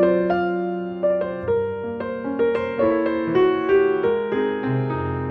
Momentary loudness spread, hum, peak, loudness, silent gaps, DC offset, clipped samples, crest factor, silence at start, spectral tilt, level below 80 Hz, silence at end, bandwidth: 8 LU; none; -6 dBFS; -22 LUFS; none; under 0.1%; under 0.1%; 16 dB; 0 s; -9.5 dB/octave; -50 dBFS; 0 s; 5.4 kHz